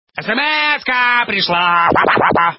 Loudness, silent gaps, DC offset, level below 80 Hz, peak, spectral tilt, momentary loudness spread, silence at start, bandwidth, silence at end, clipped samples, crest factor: -13 LUFS; none; under 0.1%; -46 dBFS; 0 dBFS; -7 dB/octave; 3 LU; 0.15 s; 5.8 kHz; 0.05 s; under 0.1%; 14 dB